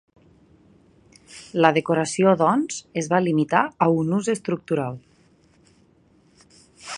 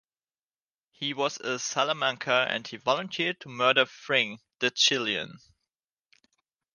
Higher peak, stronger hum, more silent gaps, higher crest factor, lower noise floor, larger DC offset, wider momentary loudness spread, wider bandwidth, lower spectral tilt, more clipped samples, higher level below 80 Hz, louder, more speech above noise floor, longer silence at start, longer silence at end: first, 0 dBFS vs -6 dBFS; neither; neither; about the same, 24 dB vs 22 dB; second, -58 dBFS vs under -90 dBFS; neither; first, 12 LU vs 9 LU; about the same, 11 kHz vs 10.5 kHz; first, -5.5 dB/octave vs -2 dB/octave; neither; first, -64 dBFS vs -76 dBFS; first, -21 LUFS vs -27 LUFS; second, 37 dB vs over 62 dB; first, 1.3 s vs 1 s; second, 0 s vs 1.4 s